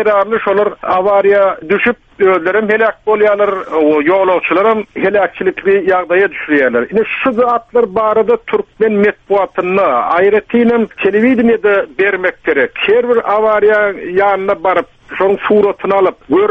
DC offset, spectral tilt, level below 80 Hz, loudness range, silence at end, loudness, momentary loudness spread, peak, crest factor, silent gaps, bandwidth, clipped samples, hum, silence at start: under 0.1%; -7.5 dB/octave; -50 dBFS; 1 LU; 0 s; -12 LUFS; 4 LU; 0 dBFS; 12 dB; none; 4.9 kHz; under 0.1%; none; 0 s